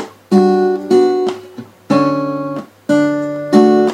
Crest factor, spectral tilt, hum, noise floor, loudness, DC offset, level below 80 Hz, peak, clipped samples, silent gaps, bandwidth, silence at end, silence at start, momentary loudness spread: 14 dB; -7 dB/octave; none; -34 dBFS; -14 LUFS; under 0.1%; -62 dBFS; 0 dBFS; under 0.1%; none; 11 kHz; 0 s; 0 s; 13 LU